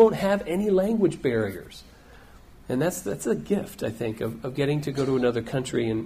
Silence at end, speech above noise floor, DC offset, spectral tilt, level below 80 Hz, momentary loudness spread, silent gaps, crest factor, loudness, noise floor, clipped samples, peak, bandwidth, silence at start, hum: 0 s; 24 dB; under 0.1%; -6 dB/octave; -52 dBFS; 9 LU; none; 20 dB; -26 LUFS; -49 dBFS; under 0.1%; -6 dBFS; 15.5 kHz; 0 s; none